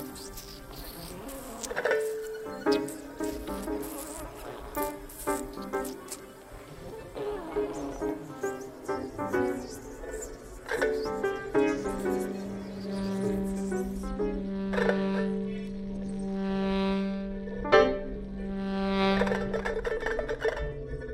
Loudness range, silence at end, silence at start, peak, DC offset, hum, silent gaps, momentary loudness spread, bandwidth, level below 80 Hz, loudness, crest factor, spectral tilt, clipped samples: 8 LU; 0 s; 0 s; -6 dBFS; under 0.1%; none; none; 14 LU; 16 kHz; -46 dBFS; -32 LUFS; 24 dB; -5.5 dB/octave; under 0.1%